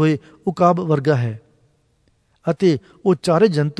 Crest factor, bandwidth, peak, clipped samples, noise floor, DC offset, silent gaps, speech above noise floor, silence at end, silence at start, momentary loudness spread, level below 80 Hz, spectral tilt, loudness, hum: 18 dB; 11 kHz; -2 dBFS; under 0.1%; -62 dBFS; under 0.1%; none; 44 dB; 0.05 s; 0 s; 11 LU; -60 dBFS; -7.5 dB/octave; -19 LUFS; none